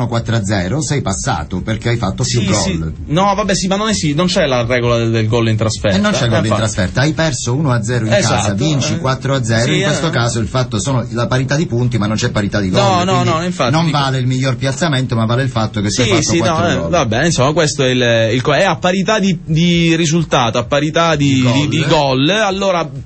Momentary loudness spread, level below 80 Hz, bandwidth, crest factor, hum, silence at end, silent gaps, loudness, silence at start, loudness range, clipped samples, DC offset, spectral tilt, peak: 4 LU; -36 dBFS; 8.8 kHz; 12 dB; none; 0 s; none; -14 LUFS; 0 s; 2 LU; under 0.1%; under 0.1%; -5 dB/octave; -2 dBFS